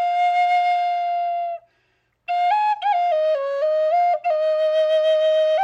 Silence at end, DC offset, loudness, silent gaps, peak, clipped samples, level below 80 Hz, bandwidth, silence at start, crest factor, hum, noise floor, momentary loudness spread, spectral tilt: 0 s; under 0.1%; -20 LUFS; none; -12 dBFS; under 0.1%; -80 dBFS; 8 kHz; 0 s; 8 dB; none; -67 dBFS; 7 LU; 0 dB/octave